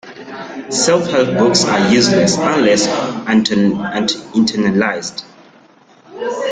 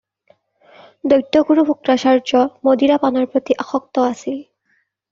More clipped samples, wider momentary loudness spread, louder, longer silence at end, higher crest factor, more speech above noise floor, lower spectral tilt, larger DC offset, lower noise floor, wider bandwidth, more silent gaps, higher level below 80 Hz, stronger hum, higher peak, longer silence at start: neither; first, 14 LU vs 9 LU; about the same, -14 LUFS vs -16 LUFS; second, 0 s vs 0.7 s; about the same, 16 dB vs 14 dB; second, 32 dB vs 49 dB; about the same, -4 dB/octave vs -3 dB/octave; neither; second, -47 dBFS vs -64 dBFS; first, 9.6 kHz vs 7.6 kHz; neither; first, -52 dBFS vs -60 dBFS; neither; about the same, 0 dBFS vs -2 dBFS; second, 0.05 s vs 1.05 s